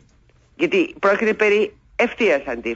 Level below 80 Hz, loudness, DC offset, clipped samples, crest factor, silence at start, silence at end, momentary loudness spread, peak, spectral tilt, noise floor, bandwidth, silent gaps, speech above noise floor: -54 dBFS; -19 LUFS; under 0.1%; under 0.1%; 14 dB; 0.6 s; 0 s; 5 LU; -6 dBFS; -5 dB/octave; -55 dBFS; 7.8 kHz; none; 36 dB